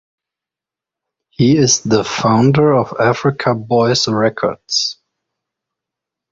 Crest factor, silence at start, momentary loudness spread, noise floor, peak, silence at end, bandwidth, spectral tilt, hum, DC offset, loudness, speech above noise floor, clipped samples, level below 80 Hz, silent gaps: 16 dB; 1.4 s; 6 LU; -87 dBFS; -2 dBFS; 1.4 s; 7.8 kHz; -4.5 dB/octave; none; under 0.1%; -14 LUFS; 73 dB; under 0.1%; -50 dBFS; none